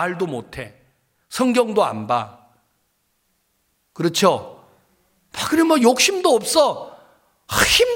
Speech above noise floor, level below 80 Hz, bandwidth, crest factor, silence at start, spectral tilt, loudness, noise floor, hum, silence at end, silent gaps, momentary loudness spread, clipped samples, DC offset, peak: 50 dB; -48 dBFS; 17 kHz; 20 dB; 0 s; -3 dB/octave; -18 LUFS; -68 dBFS; none; 0 s; none; 20 LU; under 0.1%; under 0.1%; -2 dBFS